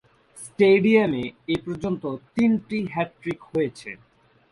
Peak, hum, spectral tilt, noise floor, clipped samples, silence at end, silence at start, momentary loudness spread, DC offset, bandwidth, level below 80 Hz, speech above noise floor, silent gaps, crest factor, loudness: -6 dBFS; none; -6.5 dB/octave; -45 dBFS; under 0.1%; 0.55 s; 0.35 s; 21 LU; under 0.1%; 11.5 kHz; -58 dBFS; 23 dB; none; 18 dB; -23 LUFS